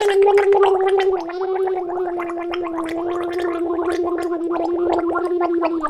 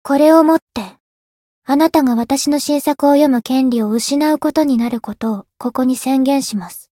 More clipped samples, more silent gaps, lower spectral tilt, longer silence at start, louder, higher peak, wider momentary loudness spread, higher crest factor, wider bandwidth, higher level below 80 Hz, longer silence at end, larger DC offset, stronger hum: neither; second, none vs 0.62-0.67 s, 1.00-1.62 s; about the same, -5 dB/octave vs -4.5 dB/octave; about the same, 0 s vs 0.05 s; second, -20 LUFS vs -15 LUFS; about the same, -2 dBFS vs 0 dBFS; about the same, 10 LU vs 12 LU; about the same, 16 dB vs 14 dB; second, 12 kHz vs 17 kHz; about the same, -52 dBFS vs -54 dBFS; second, 0 s vs 0.2 s; neither; neither